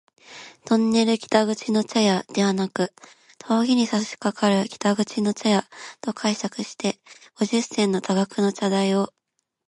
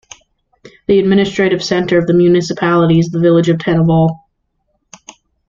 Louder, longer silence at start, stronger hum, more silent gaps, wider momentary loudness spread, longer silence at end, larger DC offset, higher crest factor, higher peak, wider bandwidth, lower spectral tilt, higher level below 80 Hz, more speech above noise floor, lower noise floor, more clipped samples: second, -23 LUFS vs -12 LUFS; second, 0.3 s vs 0.65 s; neither; neither; first, 9 LU vs 4 LU; second, 0.6 s vs 1.3 s; neither; first, 20 dB vs 12 dB; second, -4 dBFS vs 0 dBFS; first, 11.5 kHz vs 7.6 kHz; second, -5 dB/octave vs -7 dB/octave; second, -68 dBFS vs -46 dBFS; second, 22 dB vs 54 dB; second, -44 dBFS vs -65 dBFS; neither